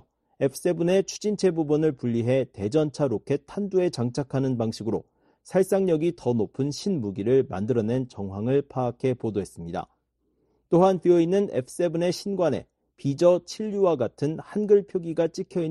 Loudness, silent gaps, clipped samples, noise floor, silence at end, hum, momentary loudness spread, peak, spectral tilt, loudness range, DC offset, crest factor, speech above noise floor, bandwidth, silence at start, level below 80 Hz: -25 LUFS; none; under 0.1%; -72 dBFS; 0 s; none; 9 LU; -6 dBFS; -7 dB/octave; 3 LU; under 0.1%; 18 dB; 47 dB; 12 kHz; 0.4 s; -60 dBFS